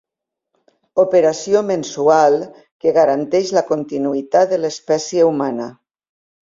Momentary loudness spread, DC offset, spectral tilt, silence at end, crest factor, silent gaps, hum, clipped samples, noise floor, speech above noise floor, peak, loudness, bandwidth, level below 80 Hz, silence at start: 8 LU; under 0.1%; -5 dB/octave; 0.75 s; 16 dB; 2.71-2.80 s; none; under 0.1%; -82 dBFS; 66 dB; -2 dBFS; -16 LUFS; 7.6 kHz; -62 dBFS; 0.95 s